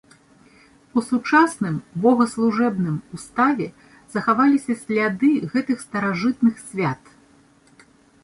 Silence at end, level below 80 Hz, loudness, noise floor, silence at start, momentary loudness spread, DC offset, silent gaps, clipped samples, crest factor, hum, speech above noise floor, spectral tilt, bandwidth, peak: 1.3 s; -62 dBFS; -21 LUFS; -54 dBFS; 0.95 s; 9 LU; under 0.1%; none; under 0.1%; 20 dB; none; 34 dB; -6.5 dB/octave; 11.5 kHz; -2 dBFS